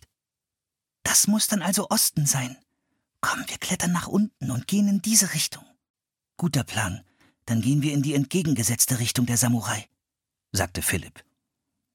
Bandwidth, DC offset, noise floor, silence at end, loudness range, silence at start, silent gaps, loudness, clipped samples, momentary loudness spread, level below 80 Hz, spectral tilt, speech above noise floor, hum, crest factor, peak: 17.5 kHz; under 0.1%; -88 dBFS; 0.75 s; 2 LU; 1.05 s; 5.90-5.94 s; -23 LUFS; under 0.1%; 11 LU; -56 dBFS; -3.5 dB/octave; 64 dB; none; 22 dB; -4 dBFS